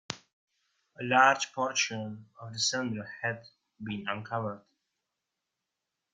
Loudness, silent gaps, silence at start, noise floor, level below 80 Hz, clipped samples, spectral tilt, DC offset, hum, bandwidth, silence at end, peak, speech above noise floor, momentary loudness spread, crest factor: -30 LUFS; 0.33-0.47 s; 0.1 s; -87 dBFS; -74 dBFS; under 0.1%; -3 dB/octave; under 0.1%; none; 9.6 kHz; 1.55 s; -8 dBFS; 56 dB; 19 LU; 26 dB